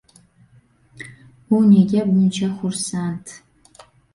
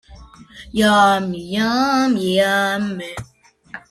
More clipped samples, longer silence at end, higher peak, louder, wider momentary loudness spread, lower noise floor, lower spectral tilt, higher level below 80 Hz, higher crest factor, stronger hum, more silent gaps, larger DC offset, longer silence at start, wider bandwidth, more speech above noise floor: neither; first, 0.75 s vs 0.1 s; about the same, -4 dBFS vs -2 dBFS; about the same, -18 LUFS vs -17 LUFS; first, 25 LU vs 18 LU; first, -54 dBFS vs -42 dBFS; first, -6.5 dB/octave vs -4.5 dB/octave; second, -58 dBFS vs -48 dBFS; about the same, 16 dB vs 16 dB; neither; neither; neither; first, 1 s vs 0.1 s; second, 11.5 kHz vs 15 kHz; first, 37 dB vs 25 dB